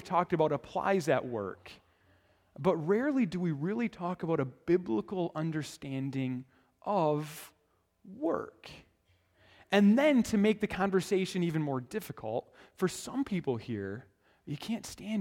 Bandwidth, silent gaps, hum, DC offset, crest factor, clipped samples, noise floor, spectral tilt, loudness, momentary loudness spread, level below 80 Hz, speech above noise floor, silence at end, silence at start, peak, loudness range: 17 kHz; none; none; under 0.1%; 20 dB; under 0.1%; -73 dBFS; -6.5 dB/octave; -32 LUFS; 14 LU; -66 dBFS; 42 dB; 0 s; 0 s; -12 dBFS; 7 LU